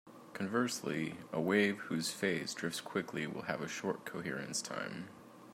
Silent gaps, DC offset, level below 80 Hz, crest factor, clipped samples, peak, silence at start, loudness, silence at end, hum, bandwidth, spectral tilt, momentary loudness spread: none; under 0.1%; -80 dBFS; 20 dB; under 0.1%; -18 dBFS; 0.05 s; -37 LUFS; 0 s; none; 16 kHz; -4 dB/octave; 10 LU